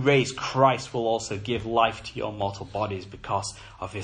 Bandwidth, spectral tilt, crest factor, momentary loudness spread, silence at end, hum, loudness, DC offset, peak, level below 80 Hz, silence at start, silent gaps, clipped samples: 10.5 kHz; -5 dB/octave; 20 dB; 12 LU; 0 s; none; -27 LUFS; under 0.1%; -6 dBFS; -52 dBFS; 0 s; none; under 0.1%